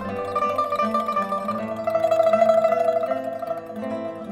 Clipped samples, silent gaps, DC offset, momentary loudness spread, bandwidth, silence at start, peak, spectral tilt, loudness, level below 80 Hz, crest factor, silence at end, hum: under 0.1%; none; under 0.1%; 12 LU; 15 kHz; 0 s; -6 dBFS; -6 dB/octave; -23 LUFS; -62 dBFS; 16 dB; 0 s; none